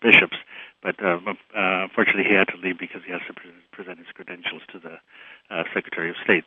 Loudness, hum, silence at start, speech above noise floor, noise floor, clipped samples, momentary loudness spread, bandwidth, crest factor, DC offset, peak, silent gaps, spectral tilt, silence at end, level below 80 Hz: -22 LUFS; none; 0 s; 24 dB; -48 dBFS; under 0.1%; 23 LU; 8.4 kHz; 24 dB; under 0.1%; 0 dBFS; none; -6.5 dB/octave; 0.05 s; -76 dBFS